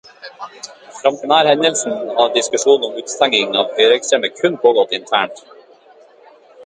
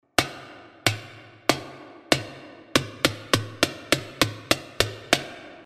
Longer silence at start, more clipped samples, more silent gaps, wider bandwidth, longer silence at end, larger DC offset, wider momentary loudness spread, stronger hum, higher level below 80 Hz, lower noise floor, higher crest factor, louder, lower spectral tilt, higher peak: about the same, 0.25 s vs 0.2 s; neither; neither; second, 9.6 kHz vs 15.5 kHz; about the same, 0 s vs 0.05 s; neither; about the same, 19 LU vs 19 LU; neither; second, -66 dBFS vs -52 dBFS; about the same, -46 dBFS vs -45 dBFS; second, 16 dB vs 28 dB; first, -15 LUFS vs -25 LUFS; about the same, -2 dB/octave vs -3 dB/octave; about the same, 0 dBFS vs 0 dBFS